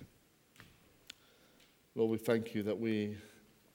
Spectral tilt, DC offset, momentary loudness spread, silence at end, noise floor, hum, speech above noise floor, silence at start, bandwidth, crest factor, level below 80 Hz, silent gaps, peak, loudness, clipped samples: -6.5 dB/octave; under 0.1%; 21 LU; 0.45 s; -68 dBFS; none; 33 dB; 0 s; 17.5 kHz; 20 dB; -76 dBFS; none; -20 dBFS; -36 LUFS; under 0.1%